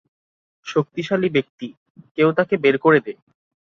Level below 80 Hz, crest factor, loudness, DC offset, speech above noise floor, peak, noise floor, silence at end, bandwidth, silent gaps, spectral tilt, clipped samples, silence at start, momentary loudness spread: -64 dBFS; 18 dB; -19 LUFS; under 0.1%; over 71 dB; -2 dBFS; under -90 dBFS; 0.6 s; 7.2 kHz; 1.49-1.58 s, 1.77-1.95 s, 2.11-2.15 s; -7 dB/octave; under 0.1%; 0.65 s; 19 LU